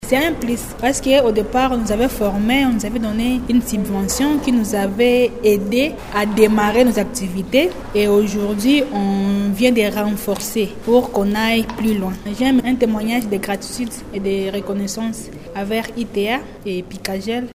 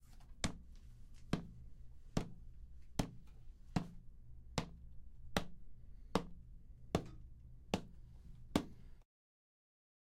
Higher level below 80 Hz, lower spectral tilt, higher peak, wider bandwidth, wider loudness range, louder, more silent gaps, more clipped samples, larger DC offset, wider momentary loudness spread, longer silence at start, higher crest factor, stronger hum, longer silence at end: first, -36 dBFS vs -54 dBFS; about the same, -5 dB/octave vs -5.5 dB/octave; first, 0 dBFS vs -14 dBFS; about the same, 16 kHz vs 15.5 kHz; first, 6 LU vs 3 LU; first, -18 LUFS vs -45 LUFS; neither; neither; neither; second, 9 LU vs 19 LU; about the same, 0 s vs 0 s; second, 18 dB vs 32 dB; neither; second, 0 s vs 1 s